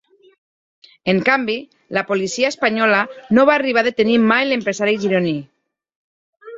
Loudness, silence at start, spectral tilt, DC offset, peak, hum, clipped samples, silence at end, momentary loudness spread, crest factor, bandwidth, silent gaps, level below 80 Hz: -17 LUFS; 1.05 s; -5 dB/octave; under 0.1%; -2 dBFS; none; under 0.1%; 0 s; 10 LU; 18 dB; 7.8 kHz; 5.96-6.33 s; -62 dBFS